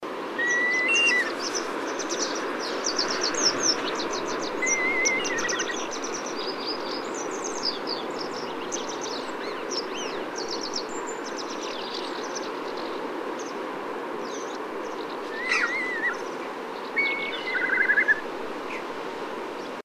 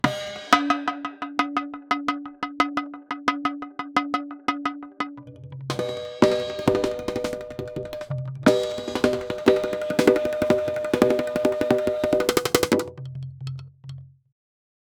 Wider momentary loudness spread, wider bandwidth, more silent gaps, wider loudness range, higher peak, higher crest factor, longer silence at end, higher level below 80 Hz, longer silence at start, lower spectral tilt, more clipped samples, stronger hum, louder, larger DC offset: about the same, 11 LU vs 13 LU; second, 16 kHz vs over 20 kHz; neither; first, 8 LU vs 5 LU; second, -10 dBFS vs -2 dBFS; about the same, 18 dB vs 22 dB; second, 0.05 s vs 0.9 s; second, -68 dBFS vs -54 dBFS; about the same, 0 s vs 0.05 s; second, -1 dB/octave vs -5 dB/octave; neither; neither; second, -27 LUFS vs -24 LUFS; neither